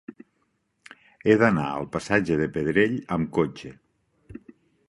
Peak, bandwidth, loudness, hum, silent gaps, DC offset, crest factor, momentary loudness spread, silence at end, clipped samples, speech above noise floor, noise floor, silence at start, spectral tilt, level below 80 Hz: -4 dBFS; 11.5 kHz; -24 LUFS; none; none; under 0.1%; 22 dB; 24 LU; 0.55 s; under 0.1%; 49 dB; -72 dBFS; 0.1 s; -7 dB/octave; -54 dBFS